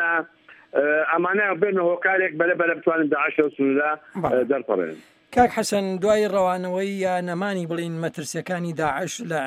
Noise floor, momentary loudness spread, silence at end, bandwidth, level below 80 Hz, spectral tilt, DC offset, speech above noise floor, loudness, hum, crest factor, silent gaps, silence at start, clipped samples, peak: -49 dBFS; 8 LU; 0 s; 15.5 kHz; -58 dBFS; -5 dB/octave; under 0.1%; 27 dB; -23 LUFS; none; 18 dB; none; 0 s; under 0.1%; -4 dBFS